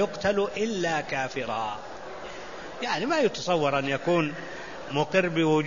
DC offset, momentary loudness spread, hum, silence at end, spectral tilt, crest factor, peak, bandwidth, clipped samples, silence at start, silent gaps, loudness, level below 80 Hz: 0.5%; 14 LU; none; 0 s; -5 dB/octave; 18 dB; -10 dBFS; 7.4 kHz; under 0.1%; 0 s; none; -27 LUFS; -58 dBFS